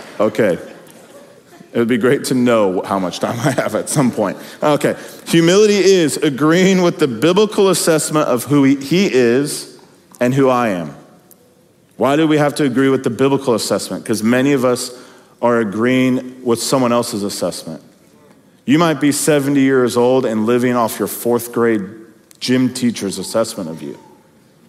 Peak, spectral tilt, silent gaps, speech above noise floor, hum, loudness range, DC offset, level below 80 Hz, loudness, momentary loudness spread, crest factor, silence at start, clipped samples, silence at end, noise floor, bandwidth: 0 dBFS; -5 dB/octave; none; 36 dB; none; 5 LU; under 0.1%; -64 dBFS; -15 LUFS; 9 LU; 16 dB; 0 s; under 0.1%; 0.7 s; -51 dBFS; 16 kHz